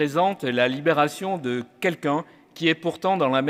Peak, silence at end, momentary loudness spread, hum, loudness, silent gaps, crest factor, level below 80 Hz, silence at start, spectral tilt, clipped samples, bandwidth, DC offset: -6 dBFS; 0 s; 7 LU; none; -24 LUFS; none; 18 dB; -74 dBFS; 0 s; -5.5 dB/octave; under 0.1%; 16 kHz; under 0.1%